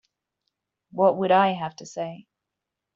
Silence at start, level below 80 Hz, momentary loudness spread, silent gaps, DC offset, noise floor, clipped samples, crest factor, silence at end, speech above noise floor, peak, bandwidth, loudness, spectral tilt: 0.95 s; -74 dBFS; 15 LU; none; under 0.1%; -85 dBFS; under 0.1%; 20 dB; 0.8 s; 62 dB; -6 dBFS; 7.6 kHz; -23 LUFS; -4 dB/octave